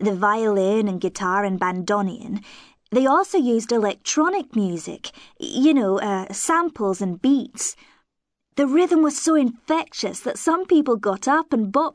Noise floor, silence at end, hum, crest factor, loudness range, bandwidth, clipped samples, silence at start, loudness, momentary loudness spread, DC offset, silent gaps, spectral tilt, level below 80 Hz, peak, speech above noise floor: -78 dBFS; 0.05 s; none; 14 dB; 2 LU; 11 kHz; under 0.1%; 0 s; -21 LUFS; 9 LU; under 0.1%; none; -4.5 dB/octave; -64 dBFS; -6 dBFS; 57 dB